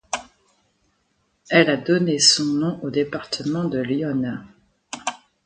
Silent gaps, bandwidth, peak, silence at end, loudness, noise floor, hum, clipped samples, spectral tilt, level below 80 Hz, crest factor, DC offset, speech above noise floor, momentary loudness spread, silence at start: none; 9.6 kHz; 0 dBFS; 0.3 s; -21 LUFS; -68 dBFS; none; under 0.1%; -3.5 dB/octave; -60 dBFS; 22 dB; under 0.1%; 48 dB; 16 LU; 0.1 s